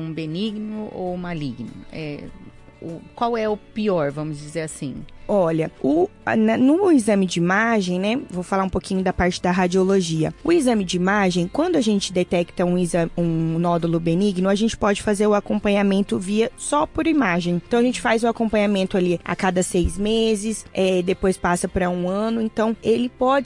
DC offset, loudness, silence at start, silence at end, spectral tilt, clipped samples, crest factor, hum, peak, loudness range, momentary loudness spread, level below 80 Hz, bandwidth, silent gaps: under 0.1%; -21 LUFS; 0 s; 0 s; -5.5 dB/octave; under 0.1%; 14 dB; none; -6 dBFS; 7 LU; 10 LU; -42 dBFS; 11.5 kHz; none